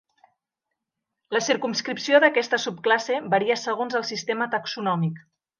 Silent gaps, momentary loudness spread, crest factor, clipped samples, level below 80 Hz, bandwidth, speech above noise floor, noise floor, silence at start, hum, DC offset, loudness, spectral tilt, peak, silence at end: none; 9 LU; 20 dB; under 0.1%; -78 dBFS; 10 kHz; 60 dB; -84 dBFS; 1.3 s; none; under 0.1%; -23 LUFS; -4 dB/octave; -4 dBFS; 0.4 s